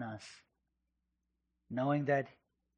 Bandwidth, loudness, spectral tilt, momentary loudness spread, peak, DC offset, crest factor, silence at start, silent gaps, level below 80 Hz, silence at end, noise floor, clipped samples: 9.4 kHz; -35 LUFS; -7.5 dB/octave; 17 LU; -20 dBFS; under 0.1%; 20 dB; 0 s; none; -78 dBFS; 0.5 s; -85 dBFS; under 0.1%